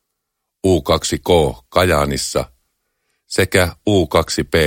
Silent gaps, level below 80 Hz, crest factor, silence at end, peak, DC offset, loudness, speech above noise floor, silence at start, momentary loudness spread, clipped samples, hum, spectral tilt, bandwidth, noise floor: none; -34 dBFS; 18 dB; 0 s; 0 dBFS; under 0.1%; -17 LUFS; 61 dB; 0.65 s; 7 LU; under 0.1%; none; -4.5 dB/octave; 17 kHz; -77 dBFS